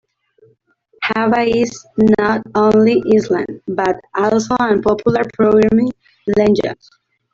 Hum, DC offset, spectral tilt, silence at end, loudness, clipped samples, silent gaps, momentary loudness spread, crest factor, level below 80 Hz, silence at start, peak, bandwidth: none; under 0.1%; -6.5 dB/octave; 0.6 s; -15 LUFS; under 0.1%; none; 8 LU; 14 dB; -48 dBFS; 1 s; -2 dBFS; 7.6 kHz